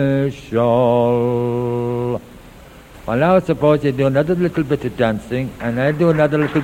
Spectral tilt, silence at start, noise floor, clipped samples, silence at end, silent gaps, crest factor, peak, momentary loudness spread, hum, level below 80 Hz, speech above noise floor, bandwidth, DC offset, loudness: -8 dB/octave; 0 s; -40 dBFS; under 0.1%; 0 s; none; 16 dB; -2 dBFS; 8 LU; none; -44 dBFS; 24 dB; 16.5 kHz; under 0.1%; -17 LUFS